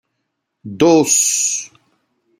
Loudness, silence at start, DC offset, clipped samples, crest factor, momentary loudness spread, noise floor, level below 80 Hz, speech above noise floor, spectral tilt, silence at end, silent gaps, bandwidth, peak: -13 LUFS; 0.65 s; under 0.1%; under 0.1%; 16 dB; 12 LU; -74 dBFS; -58 dBFS; 59 dB; -3 dB/octave; 0.75 s; none; 16.5 kHz; -2 dBFS